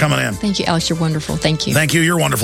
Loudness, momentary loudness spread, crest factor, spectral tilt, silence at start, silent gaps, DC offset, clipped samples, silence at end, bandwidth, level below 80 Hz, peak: -16 LUFS; 5 LU; 16 dB; -4.5 dB/octave; 0 s; none; under 0.1%; under 0.1%; 0 s; 16.5 kHz; -38 dBFS; 0 dBFS